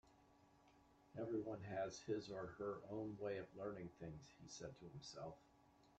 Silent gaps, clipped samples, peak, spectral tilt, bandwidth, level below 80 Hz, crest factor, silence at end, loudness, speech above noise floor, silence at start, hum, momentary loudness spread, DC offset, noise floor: none; under 0.1%; -32 dBFS; -5.5 dB/octave; 8.8 kHz; -76 dBFS; 18 dB; 0.05 s; -51 LUFS; 22 dB; 0.05 s; none; 10 LU; under 0.1%; -72 dBFS